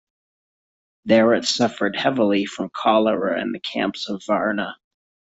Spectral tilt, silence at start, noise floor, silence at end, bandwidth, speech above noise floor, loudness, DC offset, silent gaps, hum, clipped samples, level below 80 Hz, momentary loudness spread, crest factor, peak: -4.5 dB/octave; 1.05 s; under -90 dBFS; 0.55 s; 8 kHz; over 70 dB; -21 LUFS; under 0.1%; none; none; under 0.1%; -64 dBFS; 10 LU; 18 dB; -4 dBFS